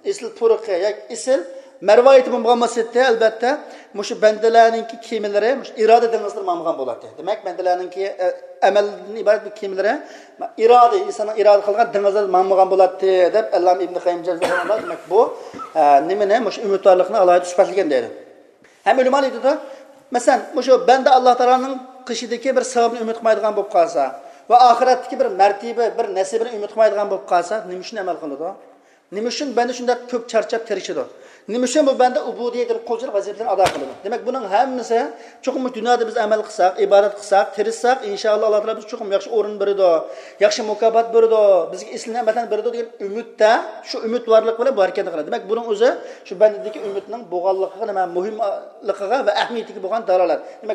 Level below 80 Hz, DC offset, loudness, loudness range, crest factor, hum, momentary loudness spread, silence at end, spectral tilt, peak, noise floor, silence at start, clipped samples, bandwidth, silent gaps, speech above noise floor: -70 dBFS; under 0.1%; -18 LUFS; 5 LU; 18 dB; none; 13 LU; 0 s; -3.5 dB/octave; 0 dBFS; -49 dBFS; 0.05 s; under 0.1%; 11.5 kHz; none; 32 dB